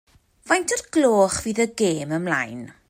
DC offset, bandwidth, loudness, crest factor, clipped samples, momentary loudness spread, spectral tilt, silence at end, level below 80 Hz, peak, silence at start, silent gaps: under 0.1%; 16 kHz; -22 LUFS; 16 dB; under 0.1%; 7 LU; -4 dB/octave; 0.2 s; -54 dBFS; -6 dBFS; 0.45 s; none